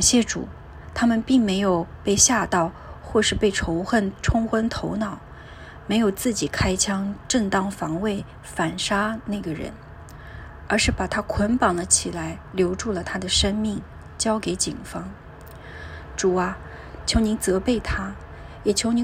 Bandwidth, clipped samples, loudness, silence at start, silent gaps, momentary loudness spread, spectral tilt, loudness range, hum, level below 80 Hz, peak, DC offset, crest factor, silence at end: 16 kHz; under 0.1%; -23 LUFS; 0 s; none; 20 LU; -3.5 dB/octave; 5 LU; none; -38 dBFS; -2 dBFS; under 0.1%; 22 dB; 0 s